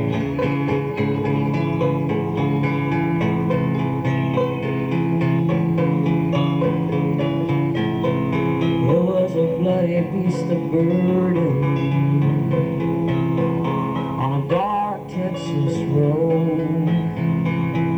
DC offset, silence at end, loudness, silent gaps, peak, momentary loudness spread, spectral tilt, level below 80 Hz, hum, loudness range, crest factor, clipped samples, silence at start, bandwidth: under 0.1%; 0 s; -20 LUFS; none; -6 dBFS; 4 LU; -9 dB/octave; -48 dBFS; none; 2 LU; 12 dB; under 0.1%; 0 s; 8.2 kHz